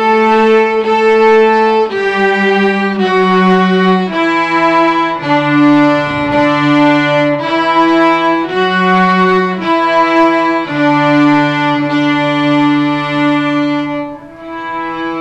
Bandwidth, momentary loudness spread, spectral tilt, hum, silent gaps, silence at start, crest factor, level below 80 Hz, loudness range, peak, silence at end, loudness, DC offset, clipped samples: 9 kHz; 5 LU; -6.5 dB/octave; none; none; 0 s; 10 dB; -48 dBFS; 2 LU; 0 dBFS; 0 s; -11 LUFS; under 0.1%; under 0.1%